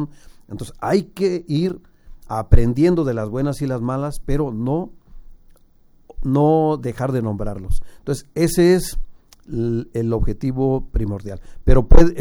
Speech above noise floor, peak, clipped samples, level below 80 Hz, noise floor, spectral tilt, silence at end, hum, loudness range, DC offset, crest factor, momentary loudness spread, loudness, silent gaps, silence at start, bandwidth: 34 dB; 0 dBFS; under 0.1%; -22 dBFS; -51 dBFS; -7.5 dB/octave; 0 s; none; 3 LU; under 0.1%; 18 dB; 15 LU; -21 LUFS; none; 0 s; 13 kHz